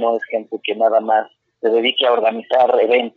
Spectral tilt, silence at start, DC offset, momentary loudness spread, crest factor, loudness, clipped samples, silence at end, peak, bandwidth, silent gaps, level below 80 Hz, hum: -5 dB/octave; 0 s; under 0.1%; 9 LU; 14 dB; -17 LUFS; under 0.1%; 0.05 s; -4 dBFS; 4.8 kHz; none; -74 dBFS; none